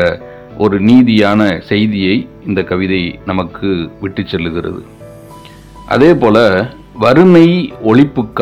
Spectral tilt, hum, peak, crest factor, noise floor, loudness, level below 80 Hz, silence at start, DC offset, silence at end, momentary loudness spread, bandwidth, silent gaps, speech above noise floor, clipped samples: -7.5 dB/octave; none; 0 dBFS; 12 dB; -34 dBFS; -11 LUFS; -40 dBFS; 0 s; under 0.1%; 0 s; 13 LU; 10.5 kHz; none; 24 dB; 2%